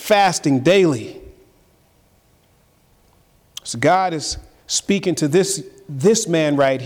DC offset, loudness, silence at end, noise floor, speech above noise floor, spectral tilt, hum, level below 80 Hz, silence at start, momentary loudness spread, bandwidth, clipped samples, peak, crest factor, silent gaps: under 0.1%; -18 LUFS; 0 s; -57 dBFS; 40 dB; -4.5 dB/octave; none; -50 dBFS; 0 s; 15 LU; 18.5 kHz; under 0.1%; -6 dBFS; 14 dB; none